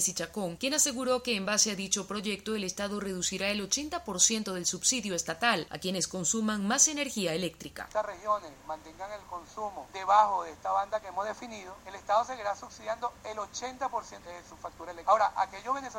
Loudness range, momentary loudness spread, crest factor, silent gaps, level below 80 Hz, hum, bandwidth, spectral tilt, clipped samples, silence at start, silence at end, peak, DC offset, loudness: 6 LU; 17 LU; 24 dB; none; -62 dBFS; none; 16.5 kHz; -2 dB/octave; under 0.1%; 0 s; 0 s; -6 dBFS; under 0.1%; -30 LUFS